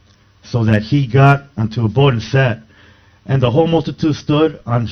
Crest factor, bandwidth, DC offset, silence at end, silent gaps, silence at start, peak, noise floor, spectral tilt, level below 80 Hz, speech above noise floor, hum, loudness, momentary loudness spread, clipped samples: 14 dB; 6.4 kHz; under 0.1%; 0 s; none; 0.45 s; 0 dBFS; -47 dBFS; -8 dB/octave; -42 dBFS; 33 dB; none; -15 LUFS; 9 LU; under 0.1%